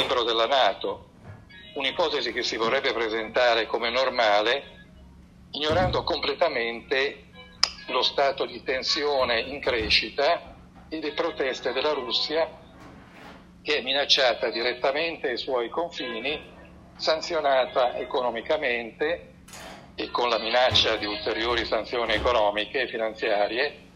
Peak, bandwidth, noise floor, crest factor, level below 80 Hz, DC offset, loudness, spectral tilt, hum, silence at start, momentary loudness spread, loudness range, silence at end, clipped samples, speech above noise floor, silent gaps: -2 dBFS; 12.5 kHz; -50 dBFS; 26 dB; -50 dBFS; under 0.1%; -25 LUFS; -3.5 dB/octave; none; 0 s; 10 LU; 3 LU; 0.1 s; under 0.1%; 24 dB; none